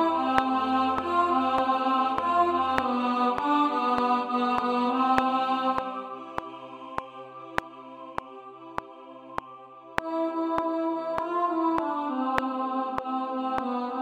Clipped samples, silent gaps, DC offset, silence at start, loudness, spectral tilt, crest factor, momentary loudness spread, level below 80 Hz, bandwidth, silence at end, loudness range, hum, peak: under 0.1%; none; under 0.1%; 0 s; -27 LUFS; -5.5 dB/octave; 26 dB; 14 LU; -58 dBFS; 12 kHz; 0 s; 13 LU; none; 0 dBFS